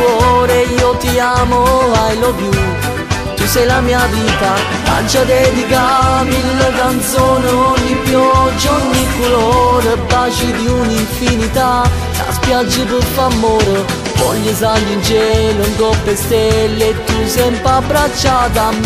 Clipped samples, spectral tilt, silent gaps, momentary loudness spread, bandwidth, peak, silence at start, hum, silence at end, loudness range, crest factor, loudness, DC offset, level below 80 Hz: under 0.1%; -4.5 dB/octave; none; 4 LU; 15.5 kHz; 0 dBFS; 0 s; none; 0 s; 2 LU; 12 dB; -12 LUFS; under 0.1%; -24 dBFS